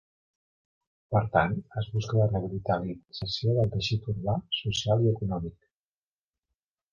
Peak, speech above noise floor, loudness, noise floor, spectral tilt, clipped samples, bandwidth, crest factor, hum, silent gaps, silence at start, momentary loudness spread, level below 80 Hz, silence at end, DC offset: -8 dBFS; over 62 dB; -28 LUFS; under -90 dBFS; -6 dB/octave; under 0.1%; 7.2 kHz; 22 dB; none; none; 1.1 s; 8 LU; -50 dBFS; 1.4 s; under 0.1%